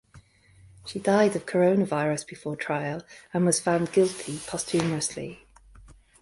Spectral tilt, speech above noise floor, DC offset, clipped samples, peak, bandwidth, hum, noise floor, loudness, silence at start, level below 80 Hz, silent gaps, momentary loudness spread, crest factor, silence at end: -5 dB/octave; 30 dB; under 0.1%; under 0.1%; -8 dBFS; 11.5 kHz; none; -56 dBFS; -26 LUFS; 0.15 s; -60 dBFS; none; 14 LU; 20 dB; 0.3 s